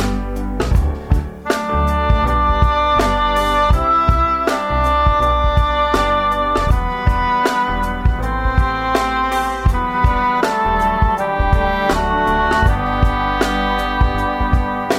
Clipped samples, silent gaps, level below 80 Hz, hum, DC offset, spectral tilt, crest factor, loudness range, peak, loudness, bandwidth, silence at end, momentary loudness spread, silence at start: under 0.1%; none; -20 dBFS; none; 0.2%; -6 dB/octave; 16 dB; 2 LU; 0 dBFS; -16 LUFS; 15 kHz; 0 s; 4 LU; 0 s